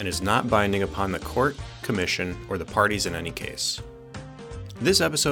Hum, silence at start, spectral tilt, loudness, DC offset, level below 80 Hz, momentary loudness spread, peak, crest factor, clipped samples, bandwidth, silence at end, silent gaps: none; 0 s; -3.5 dB/octave; -25 LUFS; under 0.1%; -46 dBFS; 18 LU; -6 dBFS; 20 dB; under 0.1%; 19 kHz; 0 s; none